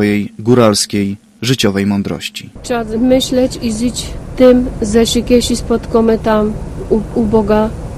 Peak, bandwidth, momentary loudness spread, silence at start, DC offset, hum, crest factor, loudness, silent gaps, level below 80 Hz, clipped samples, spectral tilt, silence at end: 0 dBFS; 15 kHz; 11 LU; 0 s; under 0.1%; none; 14 dB; -13 LUFS; none; -30 dBFS; 0.2%; -5 dB/octave; 0 s